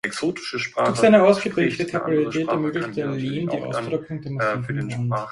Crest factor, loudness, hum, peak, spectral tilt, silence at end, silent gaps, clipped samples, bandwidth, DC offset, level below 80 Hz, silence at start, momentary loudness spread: 20 dB; -22 LUFS; none; -2 dBFS; -6 dB/octave; 0 s; none; under 0.1%; 11.5 kHz; under 0.1%; -58 dBFS; 0.05 s; 11 LU